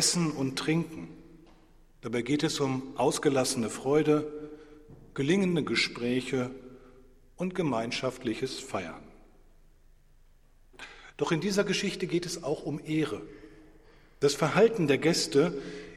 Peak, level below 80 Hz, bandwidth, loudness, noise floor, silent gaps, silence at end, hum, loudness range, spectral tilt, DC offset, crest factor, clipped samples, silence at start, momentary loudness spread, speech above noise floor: -8 dBFS; -58 dBFS; 15.5 kHz; -29 LUFS; -58 dBFS; none; 0 s; none; 7 LU; -4.5 dB/octave; under 0.1%; 22 dB; under 0.1%; 0 s; 18 LU; 30 dB